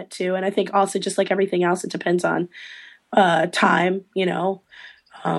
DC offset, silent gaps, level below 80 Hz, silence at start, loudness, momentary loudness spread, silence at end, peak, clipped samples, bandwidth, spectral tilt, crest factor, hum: under 0.1%; none; -72 dBFS; 0 s; -21 LUFS; 13 LU; 0 s; -2 dBFS; under 0.1%; 12.5 kHz; -5 dB/octave; 20 dB; none